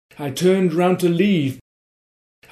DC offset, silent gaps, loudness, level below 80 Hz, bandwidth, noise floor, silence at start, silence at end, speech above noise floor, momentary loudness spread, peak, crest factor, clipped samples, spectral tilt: under 0.1%; none; -18 LUFS; -62 dBFS; 15 kHz; under -90 dBFS; 0.2 s; 0.9 s; over 72 dB; 10 LU; -6 dBFS; 14 dB; under 0.1%; -6.5 dB/octave